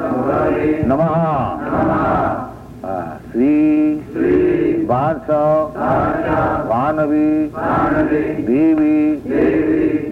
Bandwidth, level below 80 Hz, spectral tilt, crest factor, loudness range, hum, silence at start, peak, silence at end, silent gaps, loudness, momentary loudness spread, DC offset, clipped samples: 4.5 kHz; -38 dBFS; -9.5 dB/octave; 10 dB; 2 LU; none; 0 s; -6 dBFS; 0 s; none; -16 LUFS; 6 LU; under 0.1%; under 0.1%